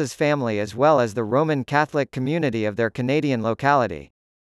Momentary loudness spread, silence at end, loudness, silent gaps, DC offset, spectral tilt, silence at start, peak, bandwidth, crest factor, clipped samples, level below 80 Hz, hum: 6 LU; 0.45 s; -22 LUFS; none; under 0.1%; -6.5 dB/octave; 0 s; -4 dBFS; 12 kHz; 18 dB; under 0.1%; -60 dBFS; none